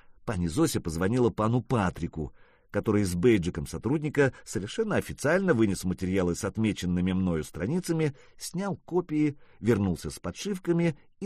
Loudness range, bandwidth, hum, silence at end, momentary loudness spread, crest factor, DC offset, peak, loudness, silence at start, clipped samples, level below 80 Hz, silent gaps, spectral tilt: 3 LU; 15 kHz; none; 0 s; 10 LU; 18 dB; under 0.1%; -10 dBFS; -28 LUFS; 0.1 s; under 0.1%; -50 dBFS; none; -6.5 dB/octave